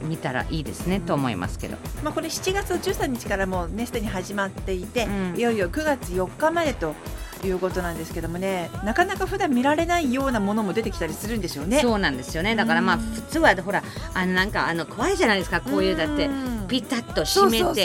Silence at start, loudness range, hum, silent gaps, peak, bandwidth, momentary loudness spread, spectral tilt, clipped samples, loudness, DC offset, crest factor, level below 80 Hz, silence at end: 0 s; 4 LU; none; none; -4 dBFS; 17 kHz; 9 LU; -4.5 dB/octave; under 0.1%; -24 LUFS; under 0.1%; 20 dB; -38 dBFS; 0 s